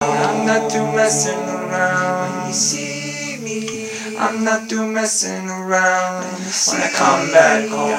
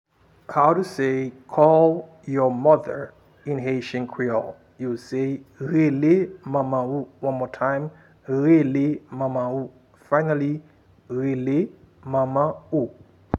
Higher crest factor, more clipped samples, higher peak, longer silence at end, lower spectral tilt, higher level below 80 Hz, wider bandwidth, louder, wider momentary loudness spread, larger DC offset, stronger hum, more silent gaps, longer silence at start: about the same, 18 dB vs 20 dB; neither; about the same, 0 dBFS vs -2 dBFS; about the same, 0 s vs 0 s; second, -3 dB/octave vs -8.5 dB/octave; about the same, -68 dBFS vs -64 dBFS; first, 16 kHz vs 11 kHz; first, -17 LUFS vs -23 LUFS; second, 10 LU vs 13 LU; neither; neither; neither; second, 0 s vs 0.5 s